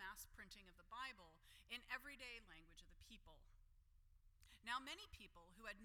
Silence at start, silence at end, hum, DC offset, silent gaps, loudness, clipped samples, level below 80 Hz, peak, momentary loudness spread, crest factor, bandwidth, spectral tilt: 0 s; 0 s; none; under 0.1%; none; -55 LUFS; under 0.1%; -70 dBFS; -34 dBFS; 16 LU; 24 dB; 18 kHz; -1.5 dB/octave